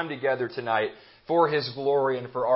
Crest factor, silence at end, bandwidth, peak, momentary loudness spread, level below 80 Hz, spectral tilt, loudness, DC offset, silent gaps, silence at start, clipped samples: 18 dB; 0 s; 5.8 kHz; -8 dBFS; 6 LU; -70 dBFS; -9.5 dB/octave; -26 LUFS; under 0.1%; none; 0 s; under 0.1%